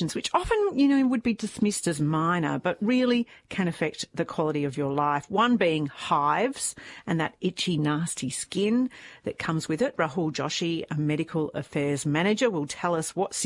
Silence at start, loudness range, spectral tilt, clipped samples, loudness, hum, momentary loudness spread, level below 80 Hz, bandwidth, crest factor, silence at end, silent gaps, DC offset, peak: 0 s; 3 LU; -5 dB/octave; under 0.1%; -26 LUFS; none; 7 LU; -56 dBFS; 11.5 kHz; 16 dB; 0 s; none; under 0.1%; -10 dBFS